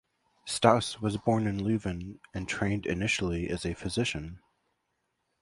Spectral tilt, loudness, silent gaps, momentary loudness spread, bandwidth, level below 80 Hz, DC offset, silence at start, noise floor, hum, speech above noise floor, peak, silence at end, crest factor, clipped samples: -5 dB/octave; -30 LUFS; none; 15 LU; 11.5 kHz; -50 dBFS; under 0.1%; 0.45 s; -79 dBFS; none; 50 dB; -4 dBFS; 1.05 s; 26 dB; under 0.1%